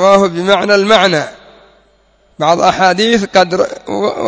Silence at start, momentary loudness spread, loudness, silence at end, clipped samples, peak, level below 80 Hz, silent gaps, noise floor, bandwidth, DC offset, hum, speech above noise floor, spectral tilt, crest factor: 0 s; 8 LU; -11 LUFS; 0 s; 0.4%; 0 dBFS; -48 dBFS; none; -52 dBFS; 8 kHz; under 0.1%; none; 41 dB; -4 dB/octave; 12 dB